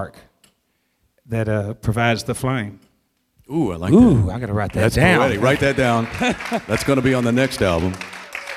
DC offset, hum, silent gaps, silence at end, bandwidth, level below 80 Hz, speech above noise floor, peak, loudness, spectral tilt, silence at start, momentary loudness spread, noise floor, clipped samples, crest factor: under 0.1%; none; none; 0 s; 15 kHz; -38 dBFS; 50 dB; 0 dBFS; -18 LUFS; -6 dB/octave; 0 s; 12 LU; -68 dBFS; under 0.1%; 20 dB